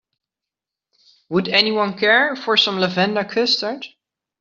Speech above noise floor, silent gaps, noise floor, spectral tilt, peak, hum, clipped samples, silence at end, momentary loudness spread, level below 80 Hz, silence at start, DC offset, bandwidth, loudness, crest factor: 68 dB; none; -86 dBFS; -1.5 dB/octave; -2 dBFS; none; under 0.1%; 0.55 s; 9 LU; -66 dBFS; 1.3 s; under 0.1%; 7.6 kHz; -17 LUFS; 18 dB